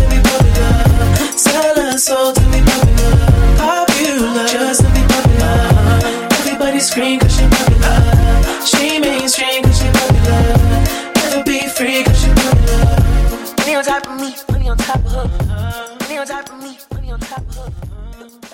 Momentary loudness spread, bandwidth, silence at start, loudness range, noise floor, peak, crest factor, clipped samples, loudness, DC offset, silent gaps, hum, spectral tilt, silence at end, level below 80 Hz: 13 LU; 17 kHz; 0 s; 8 LU; -32 dBFS; 0 dBFS; 12 dB; under 0.1%; -13 LUFS; under 0.1%; none; none; -4.5 dB/octave; 0.05 s; -16 dBFS